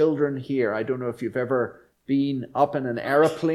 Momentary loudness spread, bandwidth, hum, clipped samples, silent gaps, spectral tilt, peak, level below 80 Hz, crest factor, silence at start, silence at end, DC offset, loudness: 8 LU; 13 kHz; none; under 0.1%; none; -7.5 dB/octave; -8 dBFS; -64 dBFS; 16 dB; 0 s; 0 s; under 0.1%; -25 LUFS